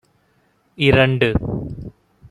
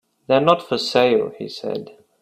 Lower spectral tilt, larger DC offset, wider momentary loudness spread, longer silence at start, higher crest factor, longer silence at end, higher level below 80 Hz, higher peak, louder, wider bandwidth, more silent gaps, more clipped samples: first, -7.5 dB/octave vs -5 dB/octave; neither; first, 20 LU vs 13 LU; first, 0.8 s vs 0.3 s; about the same, 18 dB vs 20 dB; about the same, 0.4 s vs 0.3 s; first, -36 dBFS vs -62 dBFS; about the same, -2 dBFS vs 0 dBFS; about the same, -17 LUFS vs -19 LUFS; second, 11.5 kHz vs 13 kHz; neither; neither